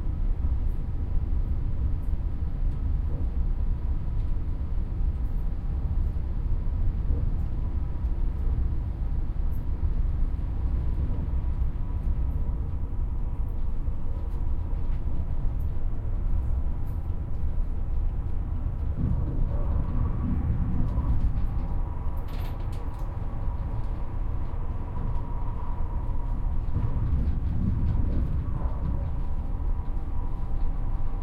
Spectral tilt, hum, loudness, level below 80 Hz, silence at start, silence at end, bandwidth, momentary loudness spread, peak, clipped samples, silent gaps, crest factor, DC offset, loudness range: -10 dB/octave; none; -31 LUFS; -28 dBFS; 0 s; 0 s; 3.2 kHz; 5 LU; -12 dBFS; under 0.1%; none; 14 dB; under 0.1%; 3 LU